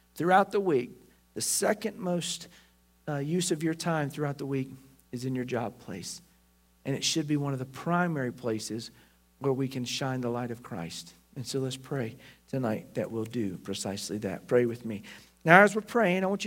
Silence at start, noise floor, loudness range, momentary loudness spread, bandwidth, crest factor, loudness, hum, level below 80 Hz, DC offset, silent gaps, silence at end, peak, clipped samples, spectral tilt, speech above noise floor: 0.15 s; -64 dBFS; 8 LU; 16 LU; 16 kHz; 28 dB; -29 LUFS; none; -68 dBFS; under 0.1%; none; 0 s; -2 dBFS; under 0.1%; -4.5 dB/octave; 35 dB